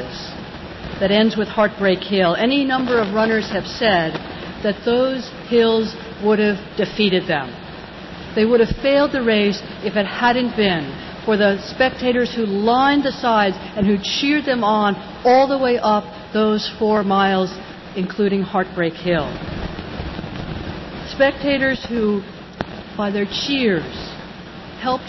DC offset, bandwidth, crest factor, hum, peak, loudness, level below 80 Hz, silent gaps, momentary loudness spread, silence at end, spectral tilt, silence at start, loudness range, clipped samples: under 0.1%; 6.2 kHz; 14 dB; none; -6 dBFS; -19 LUFS; -42 dBFS; none; 14 LU; 0 s; -6 dB/octave; 0 s; 5 LU; under 0.1%